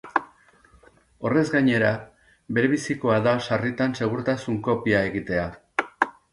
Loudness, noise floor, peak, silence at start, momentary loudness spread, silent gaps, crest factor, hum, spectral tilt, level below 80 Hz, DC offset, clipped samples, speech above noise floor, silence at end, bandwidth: -24 LUFS; -56 dBFS; -2 dBFS; 0.05 s; 8 LU; none; 22 dB; none; -6.5 dB/octave; -54 dBFS; under 0.1%; under 0.1%; 33 dB; 0.2 s; 11.5 kHz